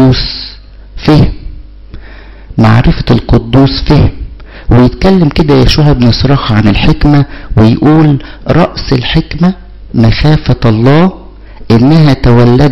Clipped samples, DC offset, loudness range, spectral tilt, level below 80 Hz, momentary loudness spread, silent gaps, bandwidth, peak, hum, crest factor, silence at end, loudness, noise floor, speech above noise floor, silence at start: under 0.1%; 2%; 3 LU; -8 dB/octave; -18 dBFS; 9 LU; none; 7.2 kHz; 0 dBFS; none; 8 dB; 0 s; -8 LUFS; -29 dBFS; 23 dB; 0 s